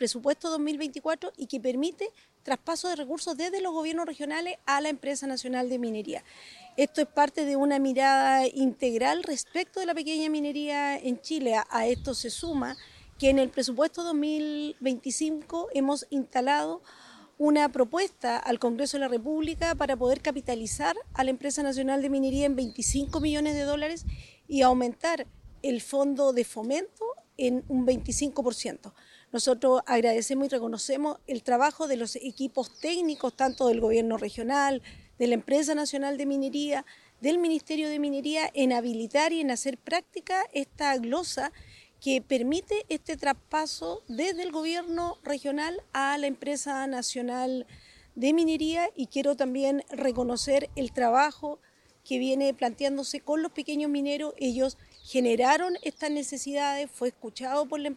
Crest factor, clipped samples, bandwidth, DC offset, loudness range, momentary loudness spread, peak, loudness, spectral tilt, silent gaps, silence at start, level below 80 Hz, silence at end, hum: 20 dB; under 0.1%; 13 kHz; under 0.1%; 4 LU; 8 LU; -8 dBFS; -28 LUFS; -3.5 dB/octave; none; 0 s; -52 dBFS; 0 s; none